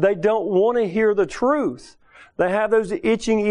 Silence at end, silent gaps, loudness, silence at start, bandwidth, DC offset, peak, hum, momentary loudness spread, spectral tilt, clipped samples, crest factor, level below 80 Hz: 0 s; none; -20 LUFS; 0 s; 10.5 kHz; under 0.1%; -6 dBFS; none; 6 LU; -6 dB/octave; under 0.1%; 14 dB; -52 dBFS